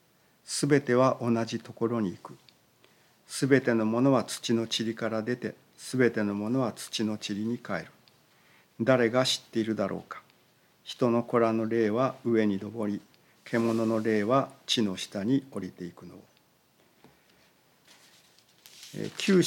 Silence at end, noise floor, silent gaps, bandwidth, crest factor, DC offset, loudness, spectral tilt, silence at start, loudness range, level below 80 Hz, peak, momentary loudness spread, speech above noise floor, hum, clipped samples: 0 s; -65 dBFS; none; 17 kHz; 22 dB; under 0.1%; -28 LUFS; -5 dB/octave; 0.5 s; 6 LU; -80 dBFS; -8 dBFS; 15 LU; 37 dB; none; under 0.1%